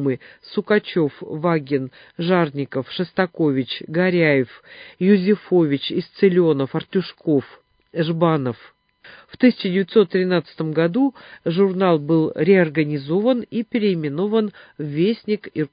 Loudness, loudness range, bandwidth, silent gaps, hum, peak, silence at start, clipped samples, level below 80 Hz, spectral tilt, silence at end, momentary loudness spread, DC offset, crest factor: -20 LUFS; 3 LU; 5.2 kHz; none; none; -2 dBFS; 0 s; under 0.1%; -64 dBFS; -12 dB/octave; 0.05 s; 10 LU; under 0.1%; 18 dB